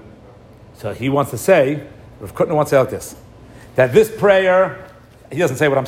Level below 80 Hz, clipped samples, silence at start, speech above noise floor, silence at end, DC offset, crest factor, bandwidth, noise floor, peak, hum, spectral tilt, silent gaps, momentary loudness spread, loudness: -50 dBFS; under 0.1%; 0.8 s; 27 dB; 0 s; under 0.1%; 16 dB; 16 kHz; -42 dBFS; 0 dBFS; none; -5.5 dB/octave; none; 17 LU; -16 LUFS